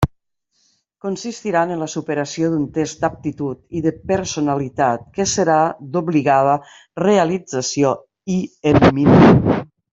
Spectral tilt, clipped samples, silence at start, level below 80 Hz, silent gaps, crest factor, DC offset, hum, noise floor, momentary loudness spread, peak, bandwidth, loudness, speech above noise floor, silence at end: -6 dB/octave; under 0.1%; 0 s; -42 dBFS; none; 16 dB; under 0.1%; none; -66 dBFS; 13 LU; -2 dBFS; 8.2 kHz; -18 LUFS; 50 dB; 0.3 s